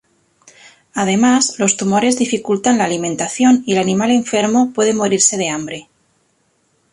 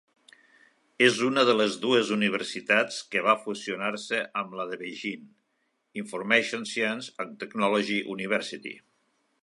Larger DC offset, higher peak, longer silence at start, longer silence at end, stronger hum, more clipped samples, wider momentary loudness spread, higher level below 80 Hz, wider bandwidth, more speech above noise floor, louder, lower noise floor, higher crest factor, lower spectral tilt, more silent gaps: neither; first, 0 dBFS vs -6 dBFS; about the same, 0.95 s vs 1 s; first, 1.1 s vs 0.65 s; neither; neither; second, 8 LU vs 14 LU; first, -58 dBFS vs -80 dBFS; about the same, 11.5 kHz vs 11.5 kHz; about the same, 47 dB vs 48 dB; first, -15 LUFS vs -27 LUFS; second, -61 dBFS vs -75 dBFS; second, 16 dB vs 22 dB; about the same, -3.5 dB/octave vs -3.5 dB/octave; neither